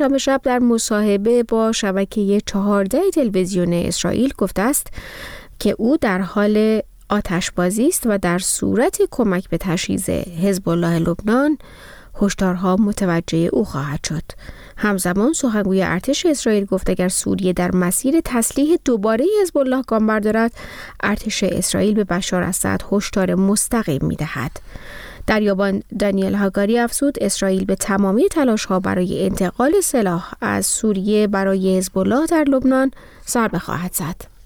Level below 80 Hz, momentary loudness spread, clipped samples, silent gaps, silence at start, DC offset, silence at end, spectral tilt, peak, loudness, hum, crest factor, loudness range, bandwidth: -40 dBFS; 7 LU; under 0.1%; none; 0 s; under 0.1%; 0.2 s; -5 dB/octave; -4 dBFS; -18 LUFS; none; 14 dB; 2 LU; 19.5 kHz